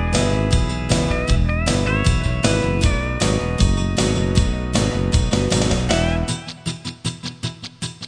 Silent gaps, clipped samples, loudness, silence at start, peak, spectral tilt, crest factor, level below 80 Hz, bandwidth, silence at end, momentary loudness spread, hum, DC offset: none; under 0.1%; -20 LUFS; 0 s; -2 dBFS; -5 dB/octave; 16 dB; -24 dBFS; 10 kHz; 0 s; 10 LU; none; under 0.1%